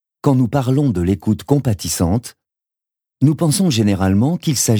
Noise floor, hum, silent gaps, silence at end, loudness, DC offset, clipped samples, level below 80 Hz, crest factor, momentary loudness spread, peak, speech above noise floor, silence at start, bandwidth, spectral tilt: -87 dBFS; none; none; 0 s; -17 LUFS; under 0.1%; under 0.1%; -42 dBFS; 14 dB; 4 LU; -2 dBFS; 71 dB; 0.25 s; over 20 kHz; -6 dB/octave